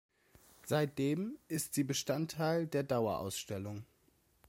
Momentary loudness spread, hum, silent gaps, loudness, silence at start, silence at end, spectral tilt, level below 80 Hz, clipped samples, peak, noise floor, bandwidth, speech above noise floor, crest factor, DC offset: 9 LU; none; none; -36 LUFS; 0.65 s; 0.65 s; -5 dB/octave; -70 dBFS; under 0.1%; -20 dBFS; -72 dBFS; 16.5 kHz; 36 dB; 18 dB; under 0.1%